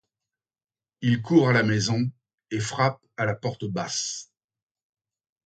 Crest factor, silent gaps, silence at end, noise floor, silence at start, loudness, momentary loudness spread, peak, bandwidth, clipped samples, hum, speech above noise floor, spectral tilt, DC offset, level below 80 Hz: 20 dB; 2.34-2.38 s; 1.2 s; under -90 dBFS; 1 s; -25 LUFS; 11 LU; -6 dBFS; 9.2 kHz; under 0.1%; none; over 66 dB; -5 dB/octave; under 0.1%; -62 dBFS